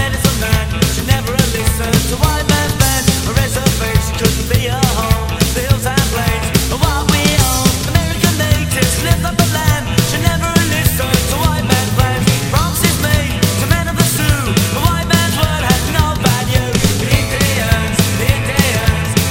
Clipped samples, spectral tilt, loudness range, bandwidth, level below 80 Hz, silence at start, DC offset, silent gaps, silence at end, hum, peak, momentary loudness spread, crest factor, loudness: under 0.1%; -4 dB/octave; 1 LU; 19 kHz; -22 dBFS; 0 s; under 0.1%; none; 0 s; none; 0 dBFS; 3 LU; 14 dB; -14 LUFS